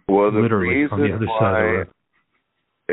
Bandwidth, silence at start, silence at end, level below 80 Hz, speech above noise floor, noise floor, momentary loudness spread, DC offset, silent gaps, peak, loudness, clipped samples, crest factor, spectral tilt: 4.1 kHz; 0.1 s; 0 s; -54 dBFS; 55 dB; -73 dBFS; 8 LU; under 0.1%; none; -4 dBFS; -19 LUFS; under 0.1%; 16 dB; -6.5 dB/octave